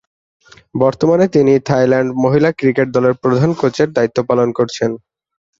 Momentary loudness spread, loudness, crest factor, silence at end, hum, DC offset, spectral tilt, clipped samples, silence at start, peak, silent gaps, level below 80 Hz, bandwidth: 5 LU; -14 LUFS; 14 dB; 0.65 s; none; under 0.1%; -7 dB/octave; under 0.1%; 0.75 s; -2 dBFS; none; -52 dBFS; 7.8 kHz